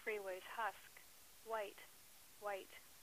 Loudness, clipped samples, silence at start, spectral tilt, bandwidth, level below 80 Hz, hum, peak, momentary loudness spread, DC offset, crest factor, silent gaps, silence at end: -48 LUFS; under 0.1%; 0 s; -1.5 dB/octave; 15.5 kHz; -82 dBFS; none; -30 dBFS; 15 LU; under 0.1%; 20 dB; none; 0 s